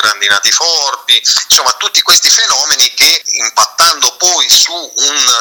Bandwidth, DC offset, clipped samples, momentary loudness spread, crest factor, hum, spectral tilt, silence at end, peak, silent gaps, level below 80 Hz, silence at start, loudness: over 20 kHz; under 0.1%; 0.8%; 5 LU; 10 dB; none; 3 dB/octave; 0 s; 0 dBFS; none; -54 dBFS; 0 s; -7 LUFS